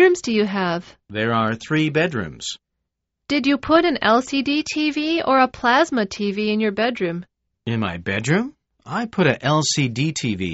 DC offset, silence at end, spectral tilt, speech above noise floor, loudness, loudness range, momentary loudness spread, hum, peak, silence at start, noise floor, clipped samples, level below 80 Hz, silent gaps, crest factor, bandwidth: under 0.1%; 0 s; -4 dB/octave; 59 dB; -20 LUFS; 4 LU; 11 LU; none; -2 dBFS; 0 s; -79 dBFS; under 0.1%; -54 dBFS; none; 18 dB; 8 kHz